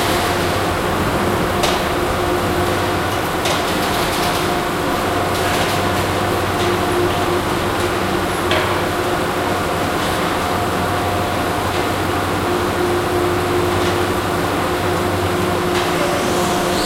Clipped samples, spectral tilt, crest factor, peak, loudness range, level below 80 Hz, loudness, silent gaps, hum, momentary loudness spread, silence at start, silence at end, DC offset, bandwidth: under 0.1%; -4.5 dB/octave; 16 dB; -2 dBFS; 1 LU; -36 dBFS; -18 LUFS; none; none; 2 LU; 0 s; 0 s; under 0.1%; 16 kHz